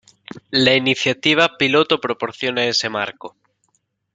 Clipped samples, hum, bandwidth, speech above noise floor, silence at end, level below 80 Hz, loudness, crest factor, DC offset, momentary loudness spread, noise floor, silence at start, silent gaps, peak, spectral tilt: under 0.1%; none; 9.4 kHz; 49 dB; 0.85 s; -62 dBFS; -17 LUFS; 18 dB; under 0.1%; 10 LU; -68 dBFS; 0.35 s; none; 0 dBFS; -3.5 dB/octave